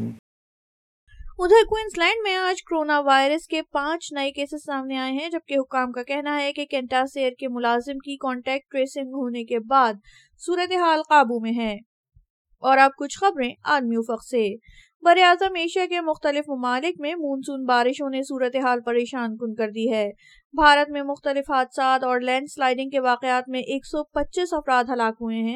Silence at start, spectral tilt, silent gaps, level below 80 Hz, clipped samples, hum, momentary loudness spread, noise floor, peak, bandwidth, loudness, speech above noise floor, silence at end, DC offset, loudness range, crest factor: 0 s; -3.5 dB/octave; 0.19-1.07 s, 11.86-12.04 s, 12.30-12.45 s, 14.95-15.00 s, 20.45-20.50 s; -52 dBFS; under 0.1%; none; 11 LU; under -90 dBFS; -2 dBFS; 13.5 kHz; -22 LUFS; over 68 dB; 0 s; under 0.1%; 4 LU; 20 dB